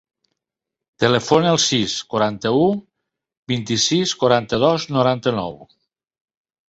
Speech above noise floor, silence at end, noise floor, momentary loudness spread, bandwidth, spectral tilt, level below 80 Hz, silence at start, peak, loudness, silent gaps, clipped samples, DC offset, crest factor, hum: 67 dB; 1.05 s; -85 dBFS; 9 LU; 8.2 kHz; -4 dB/octave; -54 dBFS; 1 s; -2 dBFS; -18 LUFS; 3.37-3.43 s; under 0.1%; under 0.1%; 18 dB; none